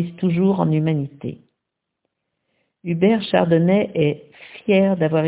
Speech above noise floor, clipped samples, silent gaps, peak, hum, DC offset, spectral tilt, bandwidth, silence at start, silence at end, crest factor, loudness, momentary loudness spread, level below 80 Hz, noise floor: 61 dB; under 0.1%; none; -4 dBFS; none; under 0.1%; -11.5 dB/octave; 4 kHz; 0 s; 0 s; 16 dB; -19 LUFS; 16 LU; -58 dBFS; -80 dBFS